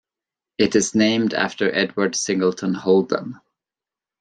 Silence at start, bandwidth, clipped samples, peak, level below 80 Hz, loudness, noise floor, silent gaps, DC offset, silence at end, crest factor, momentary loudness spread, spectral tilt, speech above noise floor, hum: 0.6 s; 9.8 kHz; under 0.1%; -2 dBFS; -62 dBFS; -20 LUFS; -90 dBFS; none; under 0.1%; 0.85 s; 18 dB; 8 LU; -4 dB/octave; 70 dB; none